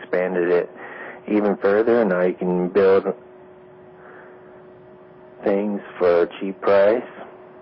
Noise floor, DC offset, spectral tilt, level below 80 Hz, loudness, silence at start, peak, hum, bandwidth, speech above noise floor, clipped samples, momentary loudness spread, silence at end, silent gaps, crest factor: -45 dBFS; under 0.1%; -11.5 dB/octave; -60 dBFS; -20 LUFS; 0 s; -8 dBFS; none; 5.6 kHz; 26 dB; under 0.1%; 18 LU; 0.2 s; none; 14 dB